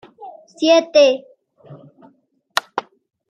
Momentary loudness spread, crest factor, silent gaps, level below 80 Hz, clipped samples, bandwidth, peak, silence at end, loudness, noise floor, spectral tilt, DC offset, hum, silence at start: 26 LU; 18 dB; none; -74 dBFS; under 0.1%; 14.5 kHz; -2 dBFS; 0.5 s; -17 LUFS; -57 dBFS; -3 dB/octave; under 0.1%; none; 0.2 s